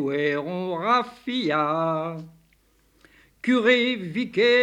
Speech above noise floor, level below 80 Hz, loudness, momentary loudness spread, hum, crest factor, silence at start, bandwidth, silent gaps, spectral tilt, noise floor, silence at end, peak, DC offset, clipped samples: 39 dB; -66 dBFS; -23 LUFS; 10 LU; none; 16 dB; 0 s; 10 kHz; none; -5.5 dB/octave; -62 dBFS; 0 s; -8 dBFS; under 0.1%; under 0.1%